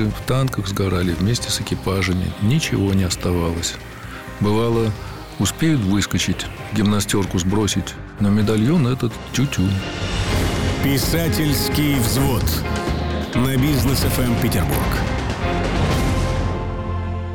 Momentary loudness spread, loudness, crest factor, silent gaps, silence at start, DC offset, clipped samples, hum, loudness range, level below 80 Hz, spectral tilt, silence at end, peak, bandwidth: 6 LU; -20 LUFS; 10 dB; none; 0 s; 0.5%; under 0.1%; none; 2 LU; -30 dBFS; -5 dB/octave; 0 s; -10 dBFS; 18.5 kHz